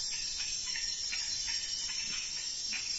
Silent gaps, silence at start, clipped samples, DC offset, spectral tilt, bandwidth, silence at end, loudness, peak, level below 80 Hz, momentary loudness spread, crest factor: none; 0 s; under 0.1%; under 0.1%; 2 dB/octave; 8.2 kHz; 0 s; -33 LUFS; -24 dBFS; -58 dBFS; 2 LU; 12 dB